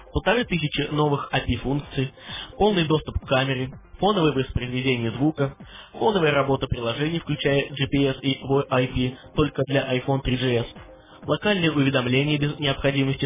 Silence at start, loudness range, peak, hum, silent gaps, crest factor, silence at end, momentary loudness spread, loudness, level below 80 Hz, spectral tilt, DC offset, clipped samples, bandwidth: 0 s; 1 LU; -8 dBFS; none; none; 16 dB; 0 s; 8 LU; -23 LUFS; -40 dBFS; -10.5 dB/octave; under 0.1%; under 0.1%; 3.9 kHz